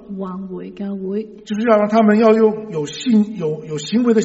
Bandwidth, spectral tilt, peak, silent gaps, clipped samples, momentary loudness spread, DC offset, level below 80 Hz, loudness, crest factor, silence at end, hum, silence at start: 8 kHz; -6 dB/octave; 0 dBFS; none; under 0.1%; 15 LU; under 0.1%; -58 dBFS; -17 LUFS; 16 dB; 0 s; none; 0 s